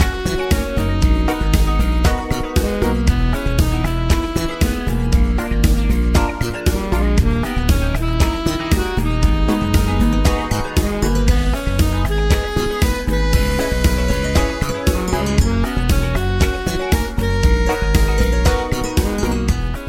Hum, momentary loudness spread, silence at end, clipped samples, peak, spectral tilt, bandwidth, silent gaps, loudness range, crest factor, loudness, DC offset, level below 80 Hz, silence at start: none; 3 LU; 0 s; under 0.1%; -2 dBFS; -5.5 dB/octave; 16.5 kHz; none; 1 LU; 14 dB; -18 LUFS; under 0.1%; -18 dBFS; 0 s